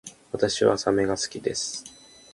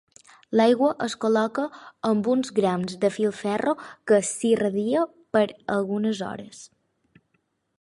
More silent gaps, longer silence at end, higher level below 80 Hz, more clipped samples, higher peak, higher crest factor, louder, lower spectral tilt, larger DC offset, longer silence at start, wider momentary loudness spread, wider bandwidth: neither; second, 0.4 s vs 1.15 s; first, -56 dBFS vs -68 dBFS; neither; about the same, -6 dBFS vs -6 dBFS; about the same, 22 dB vs 18 dB; about the same, -25 LUFS vs -24 LUFS; second, -3.5 dB/octave vs -5 dB/octave; neither; second, 0.05 s vs 0.5 s; first, 15 LU vs 9 LU; about the same, 11.5 kHz vs 11.5 kHz